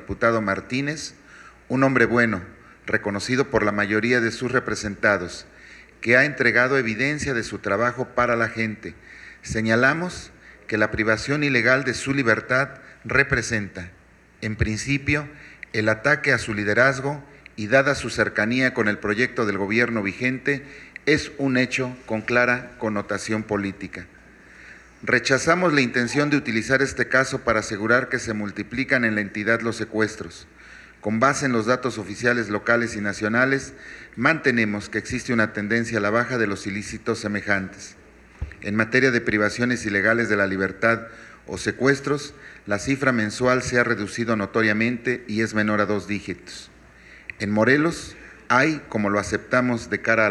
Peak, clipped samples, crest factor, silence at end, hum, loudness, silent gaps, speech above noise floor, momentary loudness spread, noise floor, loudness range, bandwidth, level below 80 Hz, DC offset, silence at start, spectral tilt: -2 dBFS; under 0.1%; 20 dB; 0 s; none; -22 LUFS; none; 25 dB; 14 LU; -48 dBFS; 3 LU; 12 kHz; -50 dBFS; under 0.1%; 0 s; -5 dB/octave